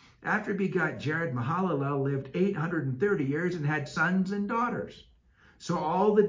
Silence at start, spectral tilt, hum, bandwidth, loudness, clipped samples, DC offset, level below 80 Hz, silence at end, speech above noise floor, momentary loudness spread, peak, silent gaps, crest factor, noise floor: 0.2 s; -7.5 dB/octave; none; 7.6 kHz; -29 LUFS; under 0.1%; under 0.1%; -62 dBFS; 0 s; 32 dB; 5 LU; -10 dBFS; none; 18 dB; -61 dBFS